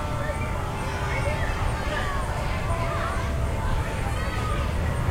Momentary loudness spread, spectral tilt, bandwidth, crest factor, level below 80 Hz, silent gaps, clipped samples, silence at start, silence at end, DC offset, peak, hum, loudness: 2 LU; -5.5 dB/octave; 16 kHz; 12 dB; -30 dBFS; none; under 0.1%; 0 s; 0 s; under 0.1%; -12 dBFS; none; -28 LUFS